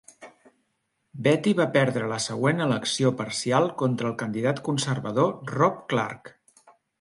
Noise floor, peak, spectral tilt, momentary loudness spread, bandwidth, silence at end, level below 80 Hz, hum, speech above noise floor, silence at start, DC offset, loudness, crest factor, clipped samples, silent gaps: -75 dBFS; -6 dBFS; -5 dB/octave; 6 LU; 11.5 kHz; 0.7 s; -66 dBFS; none; 51 dB; 0.2 s; under 0.1%; -25 LUFS; 20 dB; under 0.1%; none